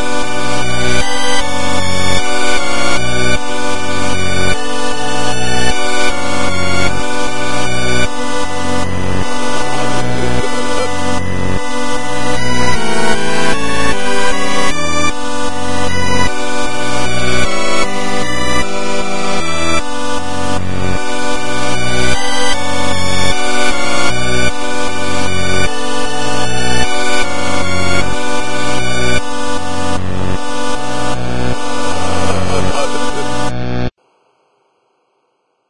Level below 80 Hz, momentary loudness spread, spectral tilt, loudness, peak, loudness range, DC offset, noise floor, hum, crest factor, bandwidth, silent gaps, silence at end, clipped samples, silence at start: -30 dBFS; 4 LU; -3.5 dB/octave; -17 LUFS; 0 dBFS; 3 LU; 40%; -63 dBFS; none; 14 dB; 11.5 kHz; none; 0 s; under 0.1%; 0 s